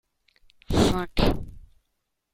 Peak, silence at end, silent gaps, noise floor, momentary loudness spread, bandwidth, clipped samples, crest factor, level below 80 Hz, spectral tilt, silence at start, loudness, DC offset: -6 dBFS; 0.75 s; none; -77 dBFS; 12 LU; 16 kHz; under 0.1%; 22 dB; -34 dBFS; -5.5 dB/octave; 0.7 s; -25 LUFS; under 0.1%